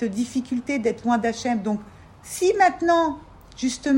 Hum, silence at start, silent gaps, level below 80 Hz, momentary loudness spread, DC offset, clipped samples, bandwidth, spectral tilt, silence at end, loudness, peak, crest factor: none; 0 s; none; -54 dBFS; 10 LU; under 0.1%; under 0.1%; 16 kHz; -4.5 dB/octave; 0 s; -23 LUFS; -4 dBFS; 18 dB